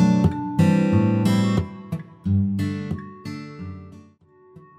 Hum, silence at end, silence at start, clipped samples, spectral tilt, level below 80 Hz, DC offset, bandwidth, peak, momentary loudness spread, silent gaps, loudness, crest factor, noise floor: none; 0.2 s; 0 s; under 0.1%; -8 dB/octave; -48 dBFS; under 0.1%; 13.5 kHz; -6 dBFS; 17 LU; none; -22 LUFS; 16 dB; -53 dBFS